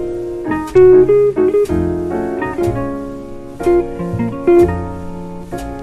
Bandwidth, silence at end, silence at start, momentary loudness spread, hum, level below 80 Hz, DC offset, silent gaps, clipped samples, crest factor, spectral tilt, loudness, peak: 12.5 kHz; 0 s; 0 s; 18 LU; none; -34 dBFS; under 0.1%; none; under 0.1%; 14 dB; -8.5 dB/octave; -14 LUFS; 0 dBFS